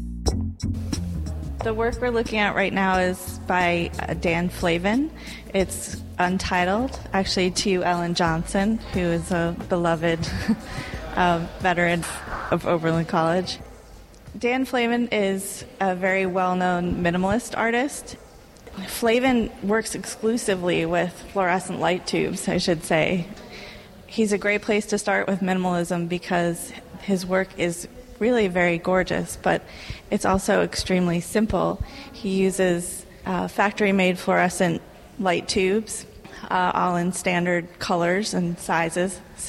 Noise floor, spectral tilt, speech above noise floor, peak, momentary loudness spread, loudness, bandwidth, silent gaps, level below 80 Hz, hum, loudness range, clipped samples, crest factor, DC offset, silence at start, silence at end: -45 dBFS; -5 dB/octave; 22 dB; -6 dBFS; 11 LU; -23 LUFS; 15.5 kHz; none; -40 dBFS; none; 2 LU; under 0.1%; 18 dB; under 0.1%; 0 s; 0 s